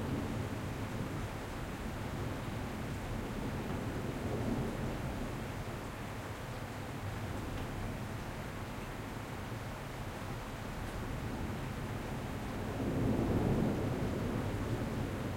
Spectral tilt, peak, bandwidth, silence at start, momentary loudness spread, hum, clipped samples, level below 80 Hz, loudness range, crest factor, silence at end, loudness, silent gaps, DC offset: -6.5 dB/octave; -20 dBFS; 16.5 kHz; 0 s; 9 LU; none; under 0.1%; -48 dBFS; 6 LU; 18 dB; 0 s; -39 LUFS; none; under 0.1%